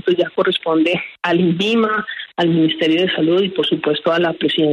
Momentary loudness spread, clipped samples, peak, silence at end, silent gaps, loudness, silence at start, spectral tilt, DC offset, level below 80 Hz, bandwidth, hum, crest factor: 3 LU; under 0.1%; -4 dBFS; 0 s; none; -17 LUFS; 0.05 s; -6.5 dB/octave; under 0.1%; -62 dBFS; 9.4 kHz; none; 12 dB